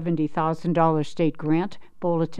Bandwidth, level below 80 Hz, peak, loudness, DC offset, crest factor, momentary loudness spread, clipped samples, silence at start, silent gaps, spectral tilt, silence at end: 9 kHz; -52 dBFS; -8 dBFS; -24 LUFS; under 0.1%; 16 dB; 6 LU; under 0.1%; 0 s; none; -8.5 dB/octave; 0 s